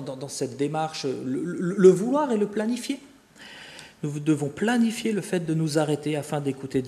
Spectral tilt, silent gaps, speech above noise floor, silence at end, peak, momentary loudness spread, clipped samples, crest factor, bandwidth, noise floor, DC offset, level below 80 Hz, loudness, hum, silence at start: -6 dB/octave; none; 23 dB; 0 s; -4 dBFS; 16 LU; under 0.1%; 20 dB; 13.5 kHz; -47 dBFS; under 0.1%; -66 dBFS; -25 LUFS; none; 0 s